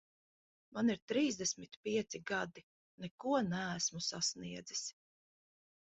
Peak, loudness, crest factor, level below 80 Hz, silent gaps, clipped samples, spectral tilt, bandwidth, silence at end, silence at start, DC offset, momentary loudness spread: -22 dBFS; -38 LUFS; 18 dB; -76 dBFS; 1.02-1.08 s, 1.77-1.83 s, 2.63-2.98 s, 3.11-3.18 s; under 0.1%; -3.5 dB/octave; 8 kHz; 1 s; 0.75 s; under 0.1%; 11 LU